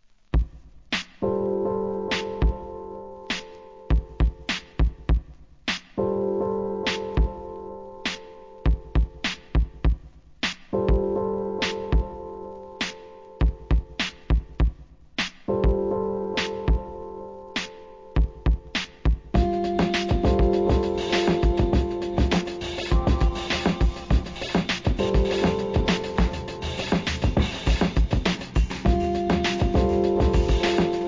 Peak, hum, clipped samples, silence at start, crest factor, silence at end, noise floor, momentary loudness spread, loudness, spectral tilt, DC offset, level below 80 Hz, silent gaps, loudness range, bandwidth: -8 dBFS; none; under 0.1%; 0.35 s; 16 dB; 0 s; -43 dBFS; 10 LU; -25 LUFS; -6 dB/octave; 0.1%; -28 dBFS; none; 5 LU; 7.6 kHz